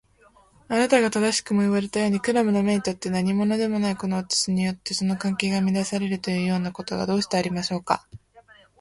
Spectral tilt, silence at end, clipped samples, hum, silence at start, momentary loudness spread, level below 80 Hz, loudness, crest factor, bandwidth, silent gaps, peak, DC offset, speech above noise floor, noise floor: -5 dB/octave; 0.4 s; under 0.1%; none; 0.7 s; 6 LU; -58 dBFS; -24 LUFS; 20 dB; 11.5 kHz; none; -4 dBFS; under 0.1%; 34 dB; -57 dBFS